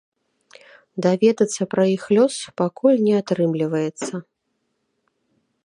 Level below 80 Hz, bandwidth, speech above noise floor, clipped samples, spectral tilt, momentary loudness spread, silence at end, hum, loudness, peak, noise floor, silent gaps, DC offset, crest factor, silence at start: -70 dBFS; 11.5 kHz; 54 dB; under 0.1%; -6 dB/octave; 11 LU; 1.45 s; none; -20 LUFS; -4 dBFS; -73 dBFS; none; under 0.1%; 18 dB; 0.95 s